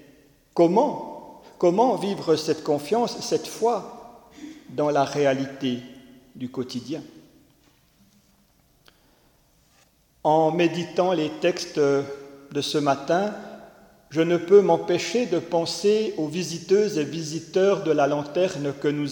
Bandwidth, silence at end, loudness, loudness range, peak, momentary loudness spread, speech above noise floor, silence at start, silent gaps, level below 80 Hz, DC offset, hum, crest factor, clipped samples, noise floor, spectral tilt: 18 kHz; 0 s; -23 LUFS; 12 LU; -6 dBFS; 15 LU; 39 dB; 0.55 s; none; -66 dBFS; under 0.1%; none; 20 dB; under 0.1%; -61 dBFS; -5.5 dB/octave